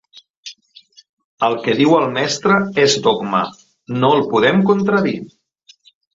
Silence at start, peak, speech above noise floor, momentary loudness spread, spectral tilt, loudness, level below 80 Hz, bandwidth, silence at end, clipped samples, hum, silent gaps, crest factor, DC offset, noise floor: 0.15 s; -2 dBFS; 36 dB; 14 LU; -5 dB/octave; -16 LUFS; -58 dBFS; 7.8 kHz; 0.85 s; under 0.1%; none; 0.30-0.43 s, 1.09-1.17 s, 1.24-1.38 s; 16 dB; under 0.1%; -51 dBFS